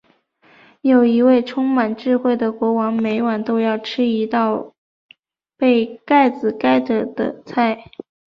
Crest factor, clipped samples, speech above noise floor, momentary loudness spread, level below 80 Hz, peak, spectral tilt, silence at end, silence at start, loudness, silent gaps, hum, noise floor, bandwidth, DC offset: 14 dB; under 0.1%; 39 dB; 7 LU; -62 dBFS; -4 dBFS; -7.5 dB/octave; 0.5 s; 0.85 s; -18 LUFS; 4.78-5.09 s; none; -56 dBFS; 6 kHz; under 0.1%